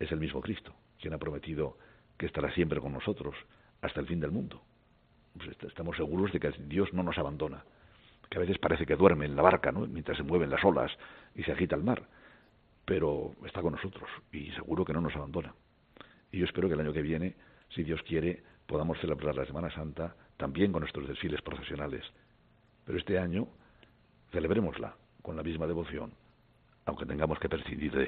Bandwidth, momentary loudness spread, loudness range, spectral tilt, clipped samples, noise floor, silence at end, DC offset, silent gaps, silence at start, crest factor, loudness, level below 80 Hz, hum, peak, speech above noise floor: 4.6 kHz; 13 LU; 8 LU; -5.5 dB/octave; under 0.1%; -65 dBFS; 0 s; under 0.1%; none; 0 s; 30 dB; -33 LUFS; -54 dBFS; none; -4 dBFS; 33 dB